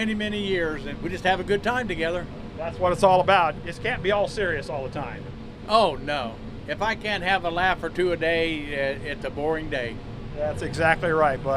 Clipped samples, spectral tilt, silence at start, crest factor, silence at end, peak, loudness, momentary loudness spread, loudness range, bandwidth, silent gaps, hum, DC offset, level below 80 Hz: under 0.1%; -5.5 dB/octave; 0 s; 20 dB; 0 s; -6 dBFS; -25 LUFS; 13 LU; 3 LU; 13.5 kHz; none; none; under 0.1%; -42 dBFS